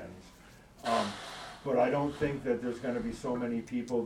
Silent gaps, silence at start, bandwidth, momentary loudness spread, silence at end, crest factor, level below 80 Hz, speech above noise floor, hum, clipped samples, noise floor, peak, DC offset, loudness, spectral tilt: none; 0 s; 14.5 kHz; 12 LU; 0 s; 18 dB; -58 dBFS; 24 dB; none; under 0.1%; -56 dBFS; -16 dBFS; under 0.1%; -33 LUFS; -6 dB/octave